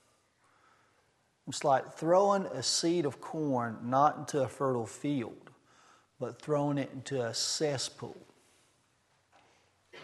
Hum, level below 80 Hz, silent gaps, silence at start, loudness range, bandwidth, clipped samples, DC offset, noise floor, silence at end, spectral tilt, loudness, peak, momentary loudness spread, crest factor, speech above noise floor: none; -78 dBFS; none; 1.45 s; 5 LU; 12.5 kHz; under 0.1%; under 0.1%; -72 dBFS; 0 s; -4.5 dB/octave; -31 LUFS; -12 dBFS; 13 LU; 20 dB; 40 dB